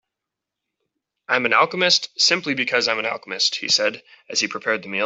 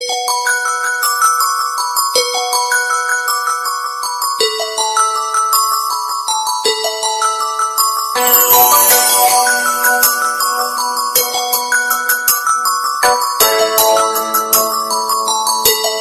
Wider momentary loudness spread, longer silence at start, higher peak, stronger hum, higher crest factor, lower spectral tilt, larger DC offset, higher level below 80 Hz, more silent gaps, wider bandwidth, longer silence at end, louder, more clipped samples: about the same, 7 LU vs 7 LU; first, 1.3 s vs 0 s; about the same, -2 dBFS vs 0 dBFS; neither; first, 20 dB vs 14 dB; first, -1.5 dB/octave vs 1.5 dB/octave; neither; second, -72 dBFS vs -56 dBFS; neither; second, 8.4 kHz vs 16.5 kHz; about the same, 0 s vs 0 s; second, -19 LUFS vs -12 LUFS; neither